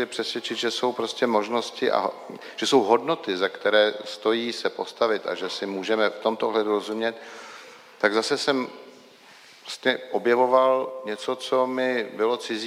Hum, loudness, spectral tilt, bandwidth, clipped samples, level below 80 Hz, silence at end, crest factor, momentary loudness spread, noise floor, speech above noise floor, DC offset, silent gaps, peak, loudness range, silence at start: none; -24 LUFS; -3.5 dB/octave; 15.5 kHz; under 0.1%; -82 dBFS; 0 s; 22 dB; 11 LU; -50 dBFS; 26 dB; under 0.1%; none; -4 dBFS; 3 LU; 0 s